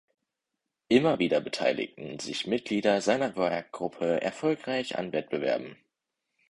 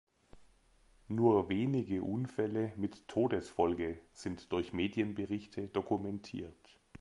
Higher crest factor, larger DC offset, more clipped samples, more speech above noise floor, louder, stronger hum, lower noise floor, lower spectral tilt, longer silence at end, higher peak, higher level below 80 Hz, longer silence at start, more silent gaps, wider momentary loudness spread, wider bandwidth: about the same, 22 dB vs 20 dB; neither; neither; first, 57 dB vs 32 dB; first, -29 LUFS vs -36 LUFS; neither; first, -85 dBFS vs -67 dBFS; second, -5 dB/octave vs -7.5 dB/octave; first, 0.75 s vs 0.05 s; first, -8 dBFS vs -16 dBFS; second, -68 dBFS vs -60 dBFS; first, 0.9 s vs 0.35 s; neither; second, 9 LU vs 12 LU; about the same, 11 kHz vs 11 kHz